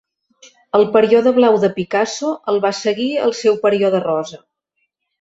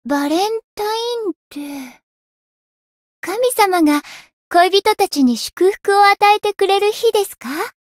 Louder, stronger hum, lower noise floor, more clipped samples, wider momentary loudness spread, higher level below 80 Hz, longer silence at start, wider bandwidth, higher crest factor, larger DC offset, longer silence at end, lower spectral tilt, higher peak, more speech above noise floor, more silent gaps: about the same, -16 LUFS vs -16 LUFS; neither; second, -71 dBFS vs under -90 dBFS; neither; second, 8 LU vs 13 LU; about the same, -62 dBFS vs -60 dBFS; first, 0.75 s vs 0.05 s; second, 8 kHz vs 16.5 kHz; about the same, 16 dB vs 16 dB; neither; first, 0.85 s vs 0.15 s; first, -5 dB/octave vs -2 dB/octave; about the same, -2 dBFS vs 0 dBFS; second, 56 dB vs over 74 dB; second, none vs 0.64-0.77 s, 1.35-1.51 s, 2.03-3.22 s, 4.33-4.51 s